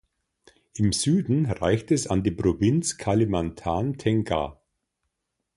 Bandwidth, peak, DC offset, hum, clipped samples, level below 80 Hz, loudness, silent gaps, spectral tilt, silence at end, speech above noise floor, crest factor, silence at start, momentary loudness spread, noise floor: 11.5 kHz; -8 dBFS; under 0.1%; none; under 0.1%; -44 dBFS; -25 LUFS; none; -6 dB/octave; 1.05 s; 57 dB; 16 dB; 0.75 s; 6 LU; -80 dBFS